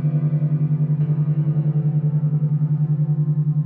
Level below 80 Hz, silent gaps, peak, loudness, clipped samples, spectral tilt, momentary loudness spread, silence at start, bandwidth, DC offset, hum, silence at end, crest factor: -68 dBFS; none; -12 dBFS; -20 LUFS; under 0.1%; -14.5 dB/octave; 0 LU; 0 s; 2 kHz; under 0.1%; none; 0 s; 8 dB